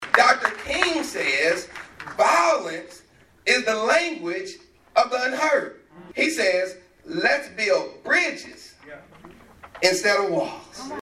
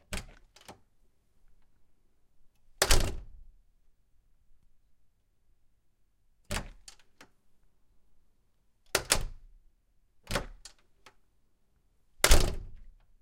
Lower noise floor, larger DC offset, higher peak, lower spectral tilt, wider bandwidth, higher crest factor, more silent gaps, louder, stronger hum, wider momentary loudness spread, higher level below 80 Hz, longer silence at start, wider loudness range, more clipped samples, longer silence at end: second, -47 dBFS vs -70 dBFS; neither; first, 0 dBFS vs -4 dBFS; about the same, -2 dB/octave vs -2.5 dB/octave; second, 13.5 kHz vs 16.5 kHz; second, 24 dB vs 30 dB; neither; first, -22 LUFS vs -30 LUFS; neither; second, 17 LU vs 23 LU; second, -60 dBFS vs -36 dBFS; about the same, 0 s vs 0.1 s; second, 2 LU vs 14 LU; neither; second, 0.05 s vs 0.4 s